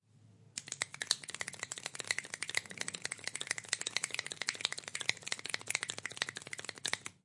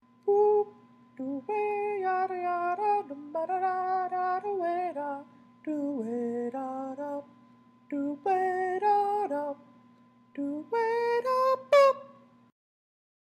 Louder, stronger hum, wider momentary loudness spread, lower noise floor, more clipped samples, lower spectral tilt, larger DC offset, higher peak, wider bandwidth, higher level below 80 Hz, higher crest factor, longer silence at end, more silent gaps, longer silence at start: second, -38 LUFS vs -29 LUFS; neither; second, 6 LU vs 13 LU; about the same, -63 dBFS vs -60 dBFS; neither; second, 0.5 dB/octave vs -5 dB/octave; neither; first, -8 dBFS vs -12 dBFS; second, 11.5 kHz vs 13.5 kHz; about the same, -86 dBFS vs -88 dBFS; first, 34 dB vs 18 dB; second, 0.1 s vs 1.25 s; neither; about the same, 0.15 s vs 0.25 s